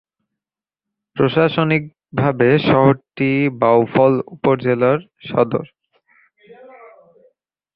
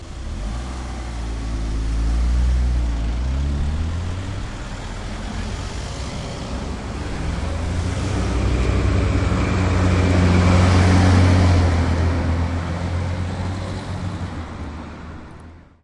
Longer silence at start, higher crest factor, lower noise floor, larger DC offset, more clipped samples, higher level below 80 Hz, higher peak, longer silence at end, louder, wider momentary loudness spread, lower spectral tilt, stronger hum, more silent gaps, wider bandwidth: first, 1.15 s vs 0 s; about the same, 16 dB vs 16 dB; first, -89 dBFS vs -41 dBFS; neither; neither; second, -54 dBFS vs -26 dBFS; about the same, -2 dBFS vs -4 dBFS; first, 2.1 s vs 0.2 s; first, -17 LUFS vs -21 LUFS; second, 8 LU vs 16 LU; first, -10.5 dB/octave vs -6.5 dB/octave; neither; neither; second, 5.6 kHz vs 11 kHz